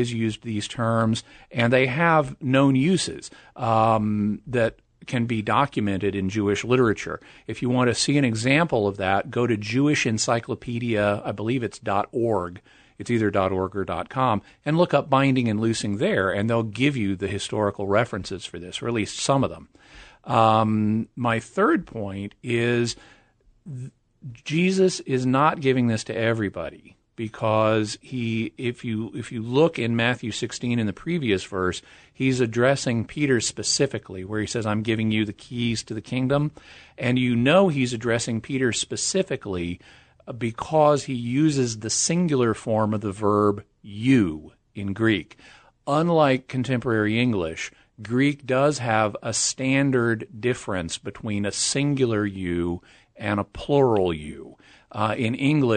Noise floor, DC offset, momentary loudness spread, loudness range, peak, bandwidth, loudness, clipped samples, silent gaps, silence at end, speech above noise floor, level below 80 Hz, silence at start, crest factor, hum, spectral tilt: -59 dBFS; under 0.1%; 12 LU; 3 LU; -4 dBFS; 9.4 kHz; -23 LUFS; under 0.1%; none; 0 s; 36 dB; -54 dBFS; 0 s; 20 dB; none; -5 dB/octave